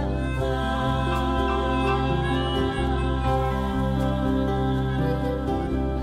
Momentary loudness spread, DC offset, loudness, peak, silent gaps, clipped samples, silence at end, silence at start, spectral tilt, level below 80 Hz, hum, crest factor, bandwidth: 3 LU; under 0.1%; -25 LUFS; -10 dBFS; none; under 0.1%; 0 s; 0 s; -7.5 dB/octave; -30 dBFS; none; 12 dB; 11.5 kHz